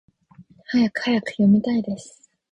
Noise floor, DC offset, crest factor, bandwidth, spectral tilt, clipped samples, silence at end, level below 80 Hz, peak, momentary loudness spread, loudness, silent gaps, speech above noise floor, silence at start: -51 dBFS; under 0.1%; 14 dB; 9.6 kHz; -6.5 dB/octave; under 0.1%; 0.4 s; -58 dBFS; -8 dBFS; 11 LU; -21 LUFS; none; 31 dB; 0.4 s